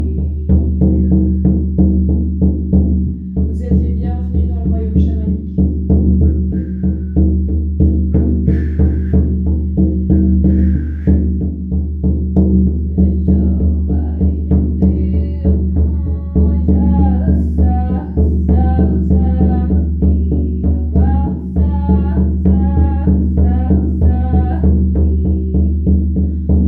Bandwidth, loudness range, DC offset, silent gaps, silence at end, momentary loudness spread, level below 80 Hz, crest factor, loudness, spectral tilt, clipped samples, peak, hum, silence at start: 2 kHz; 2 LU; under 0.1%; none; 0 s; 5 LU; -18 dBFS; 12 dB; -15 LUFS; -13 dB/octave; under 0.1%; -2 dBFS; none; 0 s